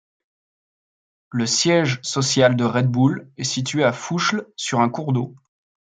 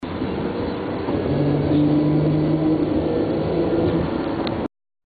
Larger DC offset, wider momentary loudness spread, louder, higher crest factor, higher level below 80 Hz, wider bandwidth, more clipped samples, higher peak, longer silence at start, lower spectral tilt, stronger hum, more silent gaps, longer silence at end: neither; about the same, 8 LU vs 8 LU; about the same, -20 LUFS vs -21 LUFS; first, 20 dB vs 12 dB; second, -64 dBFS vs -40 dBFS; first, 9.4 kHz vs 4.8 kHz; neither; first, -2 dBFS vs -8 dBFS; first, 1.3 s vs 0 s; second, -4.5 dB/octave vs -11 dB/octave; neither; neither; first, 0.6 s vs 0.4 s